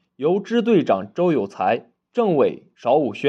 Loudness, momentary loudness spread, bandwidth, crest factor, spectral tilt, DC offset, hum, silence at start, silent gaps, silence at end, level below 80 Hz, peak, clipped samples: -21 LUFS; 5 LU; 8 kHz; 14 dB; -7.5 dB/octave; under 0.1%; none; 0.2 s; none; 0 s; -74 dBFS; -6 dBFS; under 0.1%